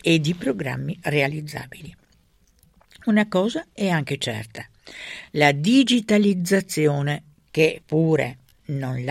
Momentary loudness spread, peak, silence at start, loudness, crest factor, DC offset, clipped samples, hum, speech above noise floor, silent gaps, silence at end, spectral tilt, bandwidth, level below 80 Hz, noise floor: 17 LU; -2 dBFS; 0.05 s; -22 LUFS; 20 dB; under 0.1%; under 0.1%; none; 38 dB; none; 0 s; -5.5 dB/octave; 15.5 kHz; -58 dBFS; -60 dBFS